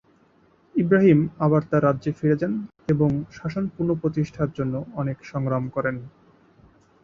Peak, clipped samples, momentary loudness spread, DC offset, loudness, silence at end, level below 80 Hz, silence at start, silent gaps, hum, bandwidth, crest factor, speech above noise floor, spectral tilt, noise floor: -6 dBFS; under 0.1%; 11 LU; under 0.1%; -23 LUFS; 0.95 s; -54 dBFS; 0.75 s; none; none; 7 kHz; 18 dB; 36 dB; -9.5 dB/octave; -59 dBFS